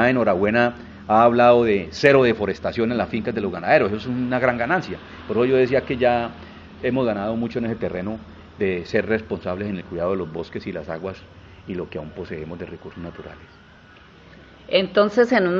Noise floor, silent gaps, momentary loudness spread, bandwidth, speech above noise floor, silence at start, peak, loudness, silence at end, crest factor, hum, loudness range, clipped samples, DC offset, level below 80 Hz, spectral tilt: -48 dBFS; none; 18 LU; 7.4 kHz; 27 dB; 0 s; 0 dBFS; -21 LUFS; 0 s; 22 dB; none; 15 LU; under 0.1%; under 0.1%; -50 dBFS; -7 dB/octave